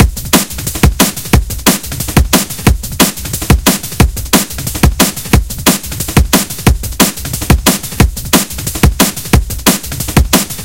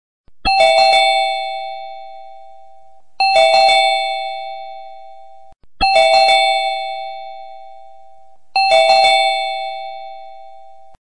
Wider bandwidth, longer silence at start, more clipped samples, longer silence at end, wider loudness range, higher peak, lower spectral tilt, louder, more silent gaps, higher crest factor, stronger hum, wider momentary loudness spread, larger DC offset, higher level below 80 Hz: first, over 20 kHz vs 10 kHz; second, 0 s vs 0.25 s; first, 0.8% vs under 0.1%; about the same, 0 s vs 0.05 s; about the same, 1 LU vs 2 LU; about the same, 0 dBFS vs -2 dBFS; first, -4 dB/octave vs -0.5 dB/octave; about the same, -11 LUFS vs -13 LUFS; neither; about the same, 12 dB vs 16 dB; neither; second, 4 LU vs 22 LU; about the same, 0.7% vs 1%; first, -18 dBFS vs -44 dBFS